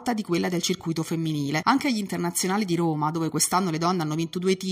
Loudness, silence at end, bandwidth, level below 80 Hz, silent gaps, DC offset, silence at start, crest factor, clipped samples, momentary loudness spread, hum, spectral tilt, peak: -25 LUFS; 0 s; 16 kHz; -64 dBFS; none; under 0.1%; 0 s; 20 dB; under 0.1%; 5 LU; none; -4.5 dB/octave; -4 dBFS